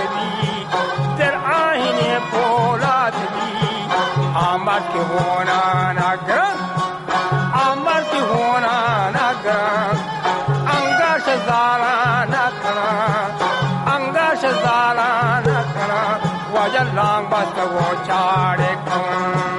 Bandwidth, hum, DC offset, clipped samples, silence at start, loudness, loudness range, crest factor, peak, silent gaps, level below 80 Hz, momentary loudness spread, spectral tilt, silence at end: 11.5 kHz; none; under 0.1%; under 0.1%; 0 s; -18 LUFS; 1 LU; 14 dB; -2 dBFS; none; -52 dBFS; 4 LU; -5.5 dB/octave; 0 s